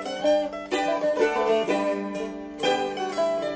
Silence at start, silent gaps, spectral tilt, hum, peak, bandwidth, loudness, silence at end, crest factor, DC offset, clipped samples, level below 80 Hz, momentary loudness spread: 0 s; none; -4 dB/octave; none; -8 dBFS; 8 kHz; -25 LUFS; 0 s; 16 dB; under 0.1%; under 0.1%; -60 dBFS; 6 LU